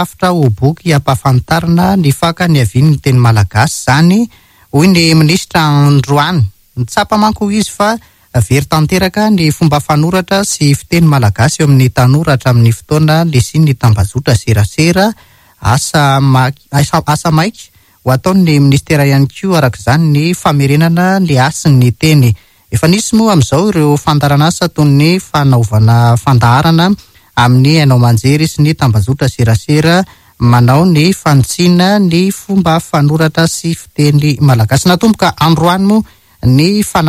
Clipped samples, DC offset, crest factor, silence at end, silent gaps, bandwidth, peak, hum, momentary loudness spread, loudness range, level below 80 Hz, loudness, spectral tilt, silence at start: 0.9%; under 0.1%; 8 dB; 0 s; none; 15.5 kHz; 0 dBFS; none; 5 LU; 2 LU; -34 dBFS; -9 LUFS; -6 dB/octave; 0 s